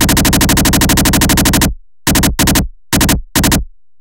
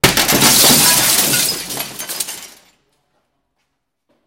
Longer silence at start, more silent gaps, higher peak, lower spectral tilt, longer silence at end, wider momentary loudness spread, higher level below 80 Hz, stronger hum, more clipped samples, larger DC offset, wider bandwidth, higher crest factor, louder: about the same, 0 s vs 0.05 s; neither; about the same, 0 dBFS vs 0 dBFS; first, -3.5 dB/octave vs -1 dB/octave; second, 0.35 s vs 1.8 s; second, 6 LU vs 16 LU; first, -20 dBFS vs -42 dBFS; neither; neither; neither; second, 17.5 kHz vs over 20 kHz; about the same, 12 dB vs 16 dB; about the same, -11 LUFS vs -11 LUFS